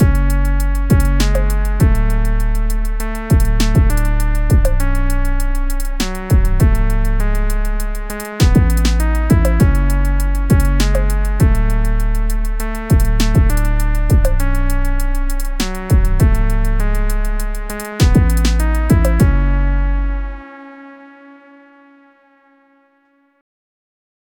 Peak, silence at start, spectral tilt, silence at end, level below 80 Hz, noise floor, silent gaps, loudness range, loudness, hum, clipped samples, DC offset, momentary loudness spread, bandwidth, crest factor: -2 dBFS; 0 s; -6 dB/octave; 3.45 s; -14 dBFS; -57 dBFS; none; 3 LU; -17 LUFS; none; under 0.1%; under 0.1%; 9 LU; 19 kHz; 12 dB